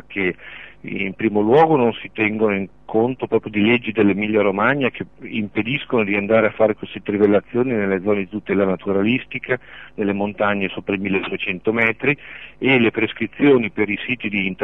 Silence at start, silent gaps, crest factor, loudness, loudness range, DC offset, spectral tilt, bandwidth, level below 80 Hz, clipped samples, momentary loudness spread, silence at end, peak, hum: 0.1 s; none; 16 dB; -19 LUFS; 3 LU; 0.4%; -9 dB/octave; 4 kHz; -56 dBFS; under 0.1%; 10 LU; 0 s; -2 dBFS; none